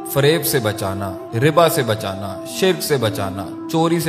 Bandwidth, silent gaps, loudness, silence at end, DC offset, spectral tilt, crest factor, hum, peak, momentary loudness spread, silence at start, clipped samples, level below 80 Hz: 15.5 kHz; none; -19 LUFS; 0 s; under 0.1%; -5 dB/octave; 18 dB; none; 0 dBFS; 11 LU; 0 s; under 0.1%; -54 dBFS